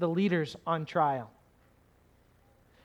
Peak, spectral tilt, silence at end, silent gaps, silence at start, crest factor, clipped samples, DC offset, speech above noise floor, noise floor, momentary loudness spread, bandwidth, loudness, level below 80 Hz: -14 dBFS; -7.5 dB/octave; 1.55 s; none; 0 s; 20 dB; under 0.1%; under 0.1%; 34 dB; -64 dBFS; 9 LU; 10.5 kHz; -30 LUFS; -70 dBFS